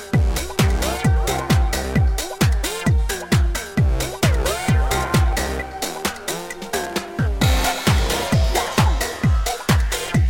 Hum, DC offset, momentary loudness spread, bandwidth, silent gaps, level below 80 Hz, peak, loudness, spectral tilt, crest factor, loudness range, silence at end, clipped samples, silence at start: none; under 0.1%; 6 LU; 17 kHz; none; -22 dBFS; -4 dBFS; -20 LUFS; -5 dB/octave; 16 dB; 2 LU; 0 s; under 0.1%; 0 s